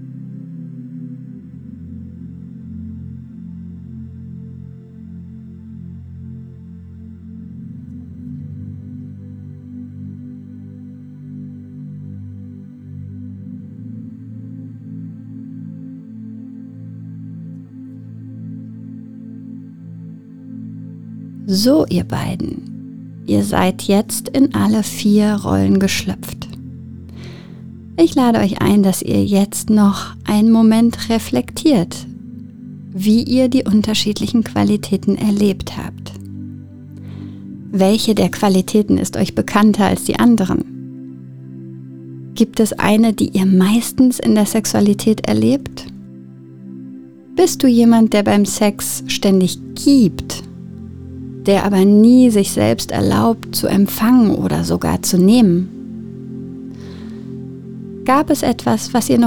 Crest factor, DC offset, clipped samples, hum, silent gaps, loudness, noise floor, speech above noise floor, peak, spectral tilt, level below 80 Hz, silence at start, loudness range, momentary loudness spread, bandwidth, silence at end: 16 dB; under 0.1%; under 0.1%; none; none; -15 LUFS; -36 dBFS; 23 dB; 0 dBFS; -5.5 dB/octave; -44 dBFS; 0 s; 19 LU; 22 LU; 19.5 kHz; 0 s